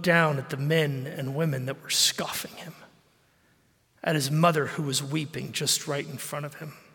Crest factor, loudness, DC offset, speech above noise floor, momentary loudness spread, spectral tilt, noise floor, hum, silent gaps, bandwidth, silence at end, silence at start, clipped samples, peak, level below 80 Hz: 22 dB; -27 LUFS; under 0.1%; 38 dB; 12 LU; -3.5 dB/octave; -65 dBFS; none; none; 17 kHz; 0.15 s; 0 s; under 0.1%; -6 dBFS; -72 dBFS